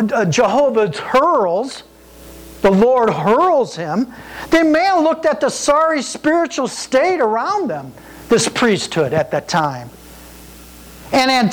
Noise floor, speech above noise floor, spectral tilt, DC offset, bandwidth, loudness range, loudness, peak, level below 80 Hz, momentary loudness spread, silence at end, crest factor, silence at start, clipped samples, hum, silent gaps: -39 dBFS; 24 dB; -4.5 dB/octave; under 0.1%; over 20 kHz; 3 LU; -16 LUFS; -6 dBFS; -46 dBFS; 9 LU; 0 s; 10 dB; 0 s; under 0.1%; none; none